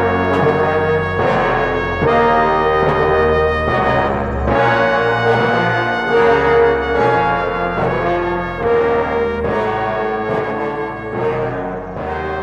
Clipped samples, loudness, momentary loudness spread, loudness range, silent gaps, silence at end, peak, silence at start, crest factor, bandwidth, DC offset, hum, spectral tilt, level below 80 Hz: under 0.1%; -16 LUFS; 8 LU; 4 LU; none; 0 s; -2 dBFS; 0 s; 14 dB; 7.8 kHz; under 0.1%; none; -7 dB/octave; -32 dBFS